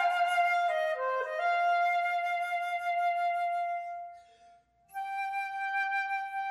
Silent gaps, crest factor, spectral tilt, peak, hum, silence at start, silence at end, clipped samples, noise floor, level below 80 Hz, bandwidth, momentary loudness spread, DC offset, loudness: none; 12 dB; 0.5 dB/octave; -18 dBFS; none; 0 s; 0 s; under 0.1%; -61 dBFS; -80 dBFS; 13 kHz; 10 LU; under 0.1%; -30 LUFS